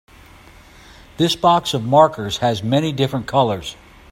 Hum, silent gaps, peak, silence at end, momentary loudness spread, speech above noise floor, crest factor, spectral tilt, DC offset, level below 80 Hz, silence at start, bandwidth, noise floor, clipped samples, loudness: none; none; 0 dBFS; 0.4 s; 7 LU; 27 dB; 18 dB; -5.5 dB/octave; under 0.1%; -48 dBFS; 1.2 s; 16 kHz; -44 dBFS; under 0.1%; -18 LUFS